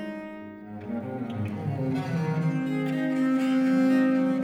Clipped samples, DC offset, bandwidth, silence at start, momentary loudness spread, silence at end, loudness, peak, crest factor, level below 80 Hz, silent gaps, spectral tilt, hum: under 0.1%; under 0.1%; 9.8 kHz; 0 s; 16 LU; 0 s; -26 LUFS; -14 dBFS; 12 dB; -68 dBFS; none; -8 dB/octave; none